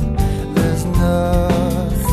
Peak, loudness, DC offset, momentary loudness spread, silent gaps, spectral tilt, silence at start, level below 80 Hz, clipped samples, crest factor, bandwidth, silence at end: -2 dBFS; -17 LUFS; under 0.1%; 3 LU; none; -7 dB/octave; 0 s; -22 dBFS; under 0.1%; 14 dB; 14 kHz; 0 s